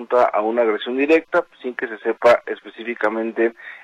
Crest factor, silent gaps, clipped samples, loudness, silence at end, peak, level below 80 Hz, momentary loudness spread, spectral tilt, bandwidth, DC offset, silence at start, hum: 16 dB; none; under 0.1%; -20 LUFS; 0.05 s; -4 dBFS; -66 dBFS; 12 LU; -5 dB/octave; 10.5 kHz; under 0.1%; 0 s; none